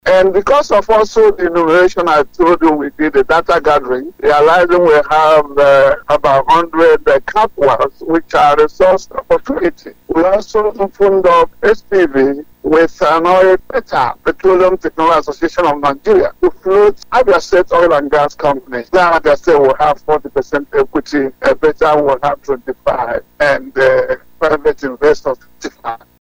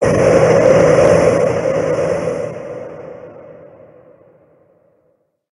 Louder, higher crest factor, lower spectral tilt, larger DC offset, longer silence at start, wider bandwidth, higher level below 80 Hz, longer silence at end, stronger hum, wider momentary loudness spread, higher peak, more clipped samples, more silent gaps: about the same, -12 LUFS vs -13 LUFS; second, 10 dB vs 16 dB; about the same, -5.5 dB/octave vs -6.5 dB/octave; neither; about the same, 0.05 s vs 0 s; first, 16.5 kHz vs 11.5 kHz; about the same, -38 dBFS vs -42 dBFS; second, 0.25 s vs 2 s; neither; second, 8 LU vs 21 LU; about the same, 0 dBFS vs 0 dBFS; neither; neither